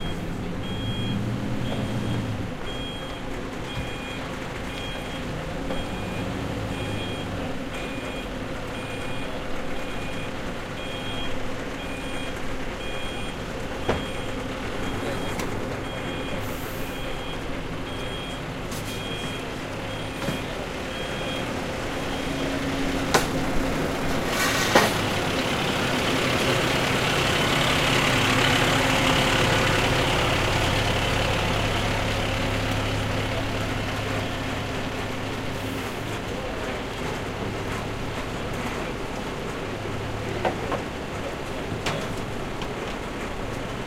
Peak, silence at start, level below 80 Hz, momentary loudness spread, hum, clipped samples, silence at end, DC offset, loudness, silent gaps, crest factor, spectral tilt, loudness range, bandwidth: -4 dBFS; 0 s; -38 dBFS; 11 LU; none; under 0.1%; 0 s; under 0.1%; -27 LUFS; none; 24 dB; -4.5 dB/octave; 11 LU; 16 kHz